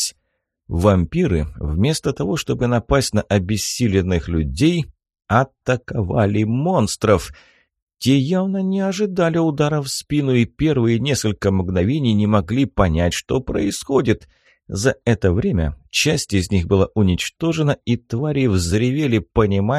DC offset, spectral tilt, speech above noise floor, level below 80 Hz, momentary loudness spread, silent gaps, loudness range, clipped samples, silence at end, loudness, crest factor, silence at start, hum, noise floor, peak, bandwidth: under 0.1%; -6 dB/octave; 54 dB; -36 dBFS; 5 LU; 7.82-7.87 s; 1 LU; under 0.1%; 0 s; -19 LUFS; 16 dB; 0 s; none; -72 dBFS; -2 dBFS; 13 kHz